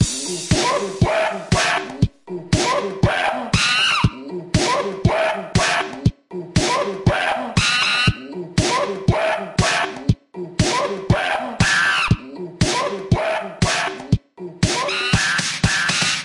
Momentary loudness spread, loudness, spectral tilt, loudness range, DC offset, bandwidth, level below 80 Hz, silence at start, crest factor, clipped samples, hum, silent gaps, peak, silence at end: 7 LU; -19 LUFS; -4 dB/octave; 2 LU; under 0.1%; 11.5 kHz; -36 dBFS; 0 s; 16 dB; under 0.1%; none; none; -4 dBFS; 0 s